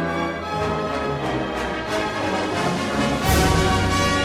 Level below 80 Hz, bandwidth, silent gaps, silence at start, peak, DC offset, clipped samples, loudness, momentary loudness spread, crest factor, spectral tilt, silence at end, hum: -32 dBFS; 17 kHz; none; 0 s; -6 dBFS; under 0.1%; under 0.1%; -22 LUFS; 7 LU; 16 dB; -4.5 dB/octave; 0 s; none